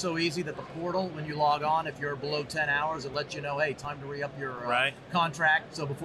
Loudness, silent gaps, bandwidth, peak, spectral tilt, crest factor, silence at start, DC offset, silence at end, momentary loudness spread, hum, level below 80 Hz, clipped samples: -30 LUFS; none; 13.5 kHz; -14 dBFS; -4.5 dB/octave; 18 dB; 0 s; under 0.1%; 0 s; 10 LU; none; -62 dBFS; under 0.1%